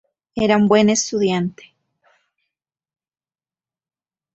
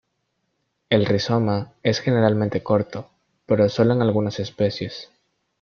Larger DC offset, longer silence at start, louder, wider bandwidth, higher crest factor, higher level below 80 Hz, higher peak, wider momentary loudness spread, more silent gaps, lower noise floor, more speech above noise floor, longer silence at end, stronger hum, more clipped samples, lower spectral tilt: neither; second, 0.35 s vs 0.9 s; first, -17 LUFS vs -21 LUFS; first, 8.2 kHz vs 7 kHz; about the same, 20 dB vs 18 dB; about the same, -58 dBFS vs -56 dBFS; about the same, -2 dBFS vs -4 dBFS; about the same, 12 LU vs 12 LU; neither; first, under -90 dBFS vs -73 dBFS; first, over 73 dB vs 53 dB; first, 2.85 s vs 0.55 s; neither; neither; second, -4.5 dB/octave vs -7 dB/octave